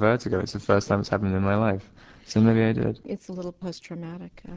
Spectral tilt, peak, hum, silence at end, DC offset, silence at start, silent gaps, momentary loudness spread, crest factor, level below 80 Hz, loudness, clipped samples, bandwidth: -7 dB/octave; -6 dBFS; none; 0 s; under 0.1%; 0 s; none; 16 LU; 18 dB; -46 dBFS; -25 LUFS; under 0.1%; 8 kHz